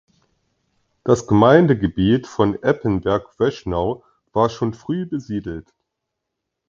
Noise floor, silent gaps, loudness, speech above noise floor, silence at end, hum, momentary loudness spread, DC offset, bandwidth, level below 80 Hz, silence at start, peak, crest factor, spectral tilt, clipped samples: -80 dBFS; none; -19 LUFS; 62 dB; 1.05 s; none; 14 LU; under 0.1%; 7.8 kHz; -44 dBFS; 1.05 s; 0 dBFS; 20 dB; -7.5 dB/octave; under 0.1%